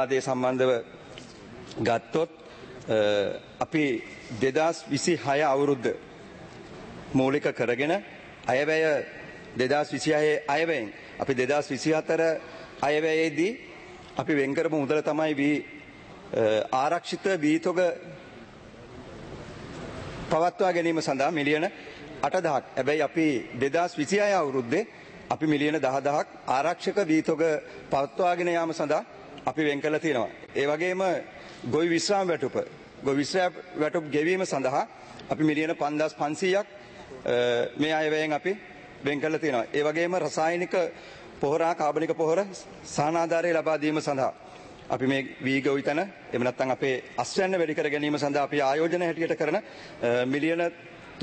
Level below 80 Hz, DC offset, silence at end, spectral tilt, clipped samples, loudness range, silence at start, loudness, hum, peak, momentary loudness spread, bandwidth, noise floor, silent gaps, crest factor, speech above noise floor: -62 dBFS; under 0.1%; 0 s; -5 dB/octave; under 0.1%; 2 LU; 0 s; -27 LUFS; none; -10 dBFS; 18 LU; 8.8 kHz; -47 dBFS; none; 18 dB; 20 dB